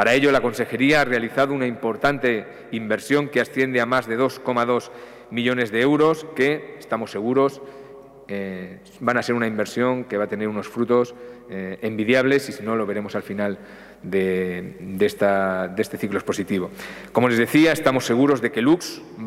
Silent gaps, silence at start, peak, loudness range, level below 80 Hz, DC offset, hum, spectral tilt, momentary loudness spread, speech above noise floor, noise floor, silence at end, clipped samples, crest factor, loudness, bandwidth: none; 0 s; -2 dBFS; 4 LU; -58 dBFS; under 0.1%; none; -5.5 dB/octave; 14 LU; 21 dB; -43 dBFS; 0 s; under 0.1%; 20 dB; -22 LUFS; 16 kHz